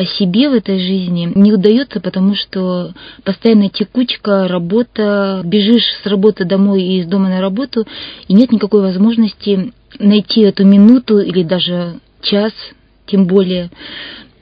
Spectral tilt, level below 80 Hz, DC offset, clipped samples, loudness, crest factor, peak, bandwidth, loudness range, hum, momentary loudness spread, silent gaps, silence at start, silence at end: -9.5 dB/octave; -50 dBFS; under 0.1%; 0.3%; -12 LUFS; 12 dB; 0 dBFS; 5.2 kHz; 4 LU; none; 11 LU; none; 0 s; 0.2 s